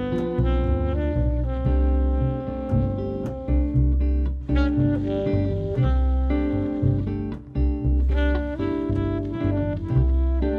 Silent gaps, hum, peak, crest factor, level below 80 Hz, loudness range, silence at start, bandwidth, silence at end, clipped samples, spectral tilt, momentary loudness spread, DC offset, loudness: none; none; -8 dBFS; 12 dB; -24 dBFS; 1 LU; 0 s; 4.4 kHz; 0 s; under 0.1%; -10.5 dB/octave; 4 LU; under 0.1%; -24 LUFS